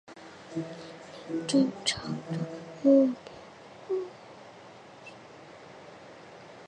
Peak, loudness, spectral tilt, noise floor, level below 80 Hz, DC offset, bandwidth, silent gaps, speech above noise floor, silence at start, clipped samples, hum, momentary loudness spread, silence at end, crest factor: -10 dBFS; -29 LUFS; -5 dB/octave; -50 dBFS; -68 dBFS; under 0.1%; 10.5 kHz; none; 23 dB; 0.1 s; under 0.1%; none; 25 LU; 0 s; 20 dB